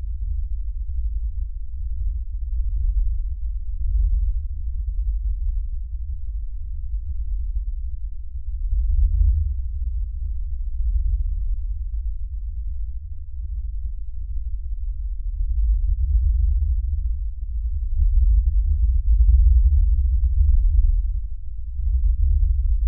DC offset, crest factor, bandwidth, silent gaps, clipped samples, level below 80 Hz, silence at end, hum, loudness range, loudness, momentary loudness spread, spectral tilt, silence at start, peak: under 0.1%; 14 dB; 0.2 kHz; none; under 0.1%; -20 dBFS; 0 s; none; 10 LU; -26 LUFS; 12 LU; -25.5 dB/octave; 0 s; -6 dBFS